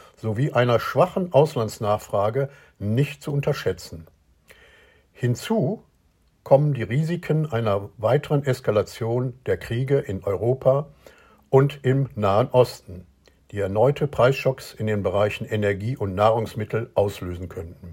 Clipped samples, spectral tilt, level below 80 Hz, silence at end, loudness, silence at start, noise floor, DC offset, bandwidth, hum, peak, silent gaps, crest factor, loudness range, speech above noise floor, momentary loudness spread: under 0.1%; -7 dB/octave; -54 dBFS; 0 s; -23 LUFS; 0.25 s; -62 dBFS; under 0.1%; 16.5 kHz; none; -4 dBFS; none; 20 dB; 5 LU; 40 dB; 10 LU